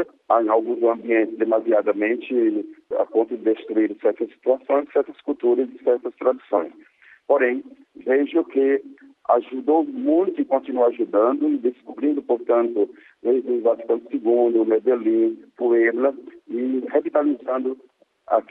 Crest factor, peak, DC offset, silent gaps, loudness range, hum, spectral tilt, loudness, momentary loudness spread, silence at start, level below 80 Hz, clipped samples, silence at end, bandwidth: 16 dB; -4 dBFS; under 0.1%; none; 2 LU; none; -8.5 dB/octave; -21 LUFS; 7 LU; 0 s; -74 dBFS; under 0.1%; 0.1 s; 3.9 kHz